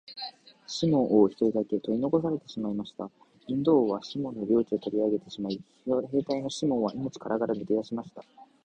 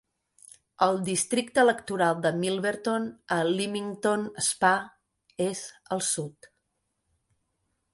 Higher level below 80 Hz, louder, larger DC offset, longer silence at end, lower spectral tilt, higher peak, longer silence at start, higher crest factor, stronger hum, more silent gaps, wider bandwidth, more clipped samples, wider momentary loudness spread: about the same, -66 dBFS vs -70 dBFS; about the same, -28 LUFS vs -27 LUFS; neither; second, 0.2 s vs 1.5 s; first, -7 dB/octave vs -3.5 dB/octave; second, -10 dBFS vs -6 dBFS; second, 0.1 s vs 0.8 s; about the same, 18 dB vs 22 dB; neither; neither; second, 9.4 kHz vs 12 kHz; neither; first, 14 LU vs 9 LU